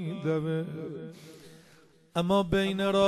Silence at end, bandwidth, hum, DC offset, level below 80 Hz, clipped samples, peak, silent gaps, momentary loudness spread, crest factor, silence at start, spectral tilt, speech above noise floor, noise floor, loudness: 0 s; 13 kHz; none; under 0.1%; -54 dBFS; under 0.1%; -12 dBFS; none; 19 LU; 16 dB; 0 s; -6.5 dB/octave; 31 dB; -59 dBFS; -29 LUFS